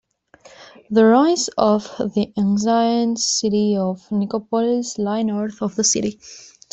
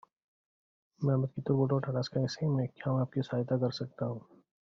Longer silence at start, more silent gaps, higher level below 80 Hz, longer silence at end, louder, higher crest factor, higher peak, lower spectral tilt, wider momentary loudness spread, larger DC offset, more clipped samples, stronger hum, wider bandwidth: second, 0.6 s vs 1 s; neither; first, -60 dBFS vs -68 dBFS; second, 0.25 s vs 0.5 s; first, -19 LUFS vs -33 LUFS; about the same, 16 dB vs 18 dB; first, -2 dBFS vs -16 dBFS; second, -4.5 dB/octave vs -7.5 dB/octave; about the same, 9 LU vs 7 LU; neither; neither; neither; first, 8.4 kHz vs 7.2 kHz